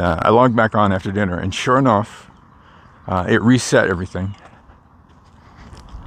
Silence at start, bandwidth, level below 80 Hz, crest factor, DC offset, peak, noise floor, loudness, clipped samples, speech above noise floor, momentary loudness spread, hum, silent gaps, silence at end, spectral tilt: 0 s; 14 kHz; -44 dBFS; 18 dB; under 0.1%; 0 dBFS; -48 dBFS; -17 LUFS; under 0.1%; 32 dB; 13 LU; none; none; 0 s; -6 dB/octave